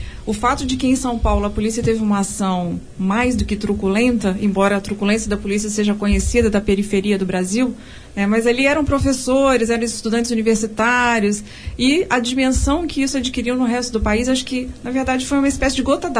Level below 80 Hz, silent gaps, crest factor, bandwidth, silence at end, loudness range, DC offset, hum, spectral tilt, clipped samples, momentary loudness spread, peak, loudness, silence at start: -30 dBFS; none; 14 dB; 11 kHz; 0 s; 2 LU; under 0.1%; none; -4.5 dB/octave; under 0.1%; 5 LU; -4 dBFS; -18 LUFS; 0 s